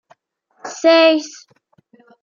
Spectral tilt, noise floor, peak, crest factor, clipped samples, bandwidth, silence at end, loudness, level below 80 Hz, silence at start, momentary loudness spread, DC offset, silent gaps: -1.5 dB/octave; -60 dBFS; -2 dBFS; 16 dB; under 0.1%; 7.4 kHz; 0.95 s; -14 LUFS; -80 dBFS; 0.65 s; 23 LU; under 0.1%; none